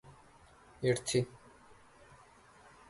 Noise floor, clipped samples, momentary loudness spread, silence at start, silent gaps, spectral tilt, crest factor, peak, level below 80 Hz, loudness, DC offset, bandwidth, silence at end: -60 dBFS; under 0.1%; 27 LU; 0.05 s; none; -5 dB/octave; 22 dB; -18 dBFS; -66 dBFS; -34 LUFS; under 0.1%; 11.5 kHz; 1.55 s